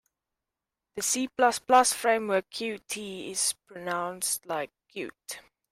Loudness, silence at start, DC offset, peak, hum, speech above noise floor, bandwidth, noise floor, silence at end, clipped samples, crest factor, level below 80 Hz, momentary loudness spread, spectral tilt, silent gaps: -27 LUFS; 0.95 s; under 0.1%; -8 dBFS; none; 60 dB; 16 kHz; -88 dBFS; 0.3 s; under 0.1%; 22 dB; -70 dBFS; 17 LU; -1.5 dB/octave; none